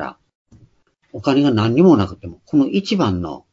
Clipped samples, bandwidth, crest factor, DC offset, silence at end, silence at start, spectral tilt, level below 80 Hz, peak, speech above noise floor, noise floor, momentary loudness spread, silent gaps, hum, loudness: under 0.1%; 7.6 kHz; 18 dB; under 0.1%; 0.15 s; 0 s; -7.5 dB/octave; -50 dBFS; 0 dBFS; 40 dB; -56 dBFS; 16 LU; 0.35-0.45 s; none; -17 LUFS